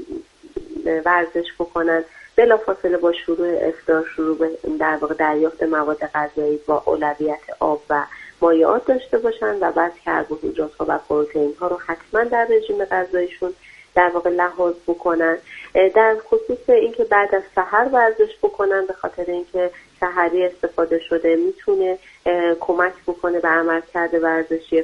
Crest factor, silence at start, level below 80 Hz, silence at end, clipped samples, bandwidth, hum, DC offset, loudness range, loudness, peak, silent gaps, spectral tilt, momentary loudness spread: 18 dB; 0 s; -54 dBFS; 0 s; under 0.1%; 7.6 kHz; none; under 0.1%; 3 LU; -19 LUFS; -2 dBFS; none; -6 dB/octave; 9 LU